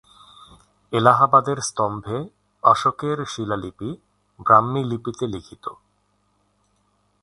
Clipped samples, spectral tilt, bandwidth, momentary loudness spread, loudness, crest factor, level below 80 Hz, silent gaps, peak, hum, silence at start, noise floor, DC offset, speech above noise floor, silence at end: under 0.1%; -5.5 dB/octave; 11.5 kHz; 18 LU; -20 LUFS; 22 dB; -56 dBFS; none; 0 dBFS; 50 Hz at -55 dBFS; 0.9 s; -66 dBFS; under 0.1%; 46 dB; 1.5 s